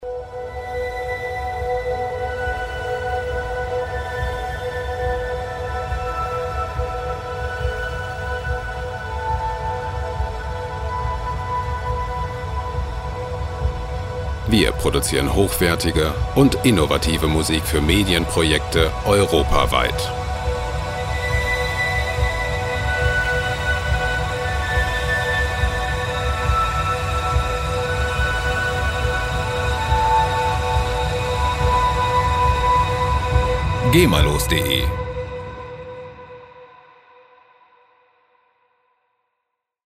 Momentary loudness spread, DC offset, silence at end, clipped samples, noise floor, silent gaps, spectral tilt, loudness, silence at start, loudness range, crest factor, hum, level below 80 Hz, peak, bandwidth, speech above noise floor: 10 LU; under 0.1%; 3.2 s; under 0.1%; -78 dBFS; none; -5 dB/octave; -21 LUFS; 0 s; 8 LU; 20 dB; none; -28 dBFS; -2 dBFS; 16 kHz; 61 dB